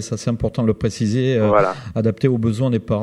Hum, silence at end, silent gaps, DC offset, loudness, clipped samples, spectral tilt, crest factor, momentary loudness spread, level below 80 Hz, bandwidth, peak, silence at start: none; 0 s; none; under 0.1%; -19 LUFS; under 0.1%; -7 dB/octave; 16 dB; 6 LU; -42 dBFS; 11.5 kHz; -2 dBFS; 0 s